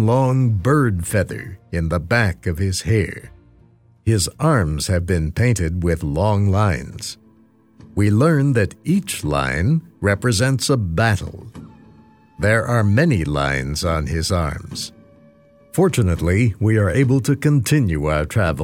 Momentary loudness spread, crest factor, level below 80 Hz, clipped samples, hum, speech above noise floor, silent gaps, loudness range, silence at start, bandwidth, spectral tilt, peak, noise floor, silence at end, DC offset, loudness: 10 LU; 14 dB; -34 dBFS; under 0.1%; none; 35 dB; none; 3 LU; 0 s; 16.5 kHz; -6 dB/octave; -4 dBFS; -53 dBFS; 0 s; under 0.1%; -19 LUFS